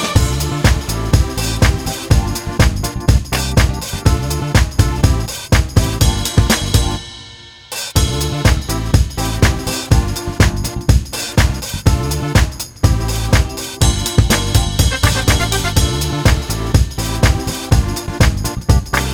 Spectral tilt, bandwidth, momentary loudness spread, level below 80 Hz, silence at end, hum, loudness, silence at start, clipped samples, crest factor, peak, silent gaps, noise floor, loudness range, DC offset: -4.5 dB/octave; over 20 kHz; 5 LU; -18 dBFS; 0 s; none; -16 LUFS; 0 s; under 0.1%; 14 dB; 0 dBFS; none; -37 dBFS; 2 LU; 0.2%